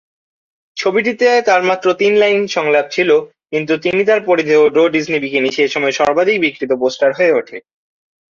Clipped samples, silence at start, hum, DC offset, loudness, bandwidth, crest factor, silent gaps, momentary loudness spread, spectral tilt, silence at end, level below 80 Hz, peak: under 0.1%; 0.75 s; none; under 0.1%; -14 LUFS; 7.4 kHz; 14 dB; none; 6 LU; -4.5 dB/octave; 0.7 s; -60 dBFS; 0 dBFS